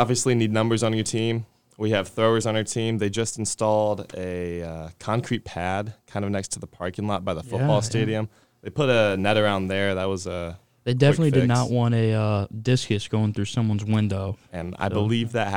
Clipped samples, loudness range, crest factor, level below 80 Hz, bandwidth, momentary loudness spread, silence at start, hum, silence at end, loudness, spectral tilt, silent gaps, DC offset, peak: under 0.1%; 5 LU; 20 dB; -54 dBFS; 15.5 kHz; 12 LU; 0 s; none; 0 s; -24 LUFS; -5.5 dB/octave; none; 0.3%; -4 dBFS